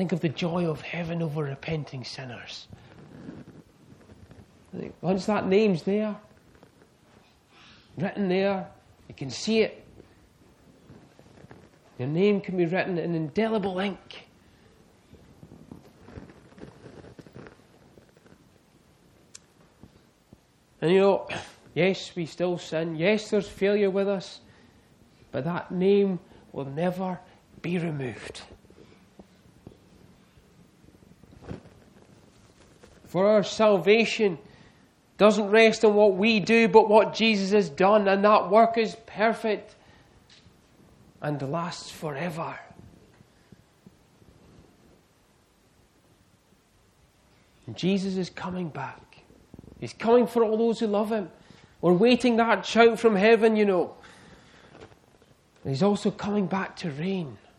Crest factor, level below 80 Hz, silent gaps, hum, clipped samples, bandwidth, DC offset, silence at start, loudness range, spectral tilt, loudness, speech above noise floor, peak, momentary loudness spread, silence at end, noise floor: 24 dB; -62 dBFS; none; none; under 0.1%; 12 kHz; under 0.1%; 0 s; 15 LU; -6 dB/octave; -24 LUFS; 38 dB; -4 dBFS; 21 LU; 0.25 s; -62 dBFS